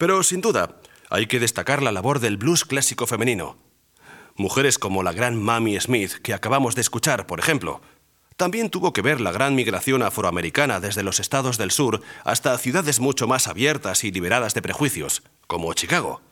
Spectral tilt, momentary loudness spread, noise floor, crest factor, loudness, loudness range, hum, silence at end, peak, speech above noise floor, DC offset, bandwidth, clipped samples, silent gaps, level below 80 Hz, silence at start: -3.5 dB/octave; 6 LU; -50 dBFS; 20 dB; -21 LUFS; 2 LU; none; 0.15 s; -2 dBFS; 28 dB; under 0.1%; 18 kHz; under 0.1%; none; -60 dBFS; 0 s